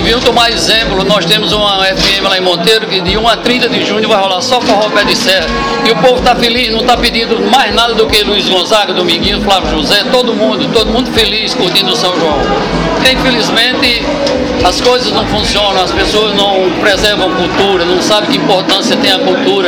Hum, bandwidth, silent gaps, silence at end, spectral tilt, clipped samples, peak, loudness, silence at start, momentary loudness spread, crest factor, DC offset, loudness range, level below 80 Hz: none; over 20 kHz; none; 0 s; -3.5 dB/octave; 0.3%; 0 dBFS; -9 LUFS; 0 s; 3 LU; 10 dB; 0.2%; 1 LU; -28 dBFS